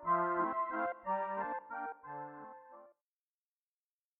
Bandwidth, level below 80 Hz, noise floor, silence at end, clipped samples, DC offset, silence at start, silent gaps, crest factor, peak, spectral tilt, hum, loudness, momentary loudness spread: 3.8 kHz; -82 dBFS; under -90 dBFS; 1.3 s; under 0.1%; under 0.1%; 0 s; none; 18 dB; -22 dBFS; -5.5 dB/octave; none; -38 LUFS; 19 LU